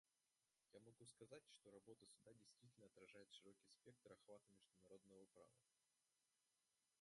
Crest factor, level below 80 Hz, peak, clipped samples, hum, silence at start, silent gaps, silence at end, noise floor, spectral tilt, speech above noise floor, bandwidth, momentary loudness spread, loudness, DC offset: 22 dB; under -90 dBFS; -50 dBFS; under 0.1%; none; 0.05 s; none; 0 s; under -90 dBFS; -4 dB/octave; over 20 dB; 11.5 kHz; 4 LU; -68 LUFS; under 0.1%